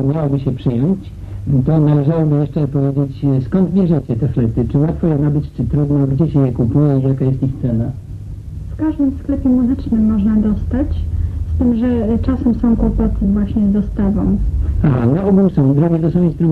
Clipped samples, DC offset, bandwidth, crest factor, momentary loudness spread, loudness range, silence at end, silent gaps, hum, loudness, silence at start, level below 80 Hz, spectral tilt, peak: under 0.1%; under 0.1%; 4.5 kHz; 12 dB; 7 LU; 2 LU; 0 s; none; none; -16 LUFS; 0 s; -26 dBFS; -11 dB/octave; -2 dBFS